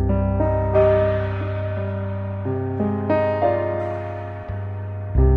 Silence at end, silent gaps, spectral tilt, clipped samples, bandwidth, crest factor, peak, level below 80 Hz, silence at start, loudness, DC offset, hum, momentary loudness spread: 0 s; none; -10.5 dB/octave; under 0.1%; 4.4 kHz; 16 dB; -6 dBFS; -28 dBFS; 0 s; -22 LUFS; under 0.1%; none; 12 LU